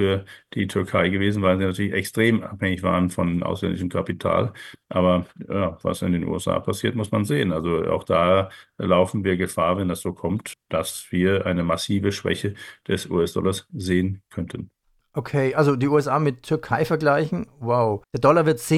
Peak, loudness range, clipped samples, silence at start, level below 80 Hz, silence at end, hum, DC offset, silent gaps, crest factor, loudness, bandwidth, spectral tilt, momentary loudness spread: -4 dBFS; 3 LU; under 0.1%; 0 s; -50 dBFS; 0 s; none; under 0.1%; none; 18 dB; -23 LUFS; 15 kHz; -6 dB/octave; 9 LU